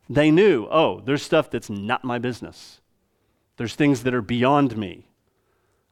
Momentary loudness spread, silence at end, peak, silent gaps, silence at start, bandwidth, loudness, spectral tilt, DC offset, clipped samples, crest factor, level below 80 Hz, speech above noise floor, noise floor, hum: 15 LU; 0.95 s; -4 dBFS; none; 0.1 s; 13.5 kHz; -21 LUFS; -6.5 dB/octave; under 0.1%; under 0.1%; 18 dB; -56 dBFS; 47 dB; -68 dBFS; none